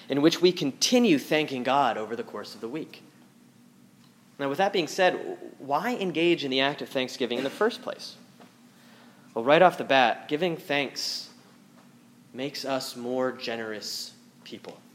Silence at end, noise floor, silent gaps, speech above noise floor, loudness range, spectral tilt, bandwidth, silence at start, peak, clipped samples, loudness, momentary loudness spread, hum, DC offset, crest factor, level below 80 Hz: 0.2 s; -56 dBFS; none; 30 dB; 7 LU; -4 dB/octave; 16.5 kHz; 0 s; -4 dBFS; under 0.1%; -26 LUFS; 17 LU; none; under 0.1%; 24 dB; -84 dBFS